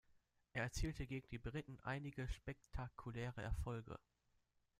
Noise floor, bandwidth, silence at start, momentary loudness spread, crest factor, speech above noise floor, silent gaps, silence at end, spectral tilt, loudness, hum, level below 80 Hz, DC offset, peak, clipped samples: -82 dBFS; 15 kHz; 0.55 s; 6 LU; 18 dB; 35 dB; none; 0.8 s; -5.5 dB/octave; -49 LUFS; none; -54 dBFS; under 0.1%; -30 dBFS; under 0.1%